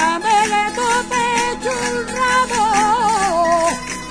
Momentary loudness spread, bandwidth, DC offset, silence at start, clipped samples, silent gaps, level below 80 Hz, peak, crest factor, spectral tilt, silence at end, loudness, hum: 5 LU; 11 kHz; under 0.1%; 0 s; under 0.1%; none; -42 dBFS; -2 dBFS; 14 dB; -2.5 dB/octave; 0 s; -16 LUFS; none